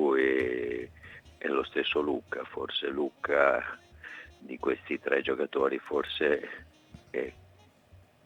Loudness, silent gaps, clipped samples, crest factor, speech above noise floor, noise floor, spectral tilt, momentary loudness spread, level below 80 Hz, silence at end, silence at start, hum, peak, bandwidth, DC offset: -30 LUFS; none; under 0.1%; 22 dB; 29 dB; -59 dBFS; -5.5 dB/octave; 19 LU; -64 dBFS; 0.3 s; 0 s; none; -10 dBFS; 8.8 kHz; under 0.1%